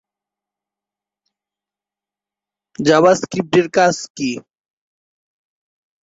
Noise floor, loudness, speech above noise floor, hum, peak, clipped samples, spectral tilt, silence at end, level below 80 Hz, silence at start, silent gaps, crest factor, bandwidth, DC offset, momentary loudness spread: -89 dBFS; -16 LUFS; 74 dB; 50 Hz at -50 dBFS; -2 dBFS; under 0.1%; -4.5 dB/octave; 1.65 s; -60 dBFS; 2.8 s; 4.10-4.15 s; 20 dB; 8 kHz; under 0.1%; 11 LU